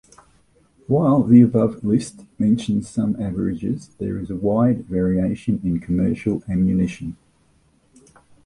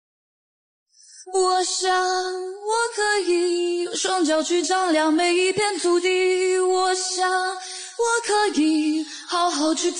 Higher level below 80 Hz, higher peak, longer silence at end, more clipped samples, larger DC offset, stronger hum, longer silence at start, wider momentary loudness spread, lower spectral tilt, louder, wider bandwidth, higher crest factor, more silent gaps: first, -44 dBFS vs -70 dBFS; first, -2 dBFS vs -8 dBFS; first, 1.3 s vs 0 s; neither; neither; neither; second, 0.9 s vs 1.15 s; first, 13 LU vs 6 LU; first, -8.5 dB/octave vs -1 dB/octave; about the same, -20 LUFS vs -21 LUFS; about the same, 11 kHz vs 10 kHz; about the same, 18 dB vs 14 dB; neither